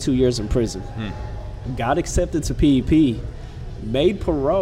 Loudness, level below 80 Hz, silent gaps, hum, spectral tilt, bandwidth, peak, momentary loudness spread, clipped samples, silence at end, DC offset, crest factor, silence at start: -21 LUFS; -30 dBFS; none; none; -6.5 dB/octave; 13.5 kHz; -6 dBFS; 15 LU; under 0.1%; 0 s; under 0.1%; 14 dB; 0 s